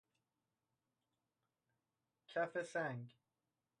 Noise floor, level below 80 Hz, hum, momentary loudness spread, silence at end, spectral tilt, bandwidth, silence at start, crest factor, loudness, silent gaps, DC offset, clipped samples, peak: under -90 dBFS; under -90 dBFS; none; 11 LU; 0.7 s; -5.5 dB/octave; 10 kHz; 2.3 s; 20 dB; -44 LUFS; none; under 0.1%; under 0.1%; -30 dBFS